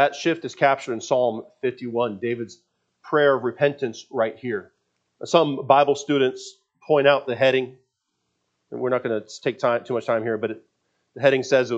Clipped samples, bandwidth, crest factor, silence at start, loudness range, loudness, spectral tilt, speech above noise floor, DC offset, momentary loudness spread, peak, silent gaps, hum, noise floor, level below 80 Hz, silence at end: under 0.1%; 8 kHz; 22 dB; 0 s; 4 LU; -22 LUFS; -5 dB/octave; 54 dB; under 0.1%; 12 LU; -2 dBFS; none; none; -76 dBFS; -78 dBFS; 0 s